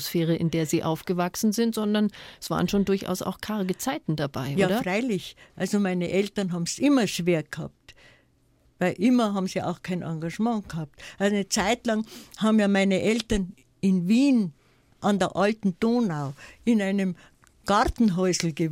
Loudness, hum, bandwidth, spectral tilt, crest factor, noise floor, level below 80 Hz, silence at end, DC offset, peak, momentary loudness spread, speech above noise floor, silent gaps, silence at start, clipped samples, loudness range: -25 LUFS; none; 16.5 kHz; -5.5 dB/octave; 20 dB; -63 dBFS; -50 dBFS; 0 s; under 0.1%; -4 dBFS; 10 LU; 38 dB; none; 0 s; under 0.1%; 3 LU